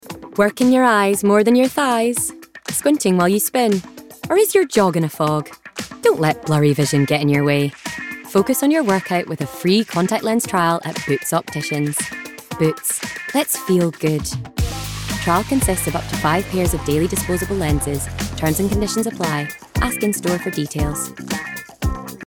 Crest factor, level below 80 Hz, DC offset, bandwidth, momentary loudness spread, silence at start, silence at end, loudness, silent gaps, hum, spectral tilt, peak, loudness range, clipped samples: 16 dB; -36 dBFS; under 0.1%; 19.5 kHz; 10 LU; 0.05 s; 0 s; -19 LUFS; none; none; -5 dB/octave; -4 dBFS; 4 LU; under 0.1%